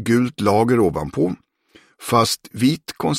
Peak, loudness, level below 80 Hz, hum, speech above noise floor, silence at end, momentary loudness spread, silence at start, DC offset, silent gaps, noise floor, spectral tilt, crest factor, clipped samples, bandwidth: -2 dBFS; -19 LUFS; -48 dBFS; none; 35 dB; 0 s; 7 LU; 0 s; under 0.1%; none; -54 dBFS; -5.5 dB/octave; 16 dB; under 0.1%; 16.5 kHz